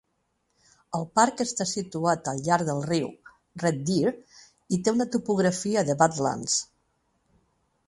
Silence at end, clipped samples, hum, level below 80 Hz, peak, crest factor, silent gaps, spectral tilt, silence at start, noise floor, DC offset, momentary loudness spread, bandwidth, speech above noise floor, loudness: 1.25 s; under 0.1%; none; -64 dBFS; -4 dBFS; 22 dB; none; -4.5 dB/octave; 0.9 s; -74 dBFS; under 0.1%; 9 LU; 11.5 kHz; 49 dB; -26 LUFS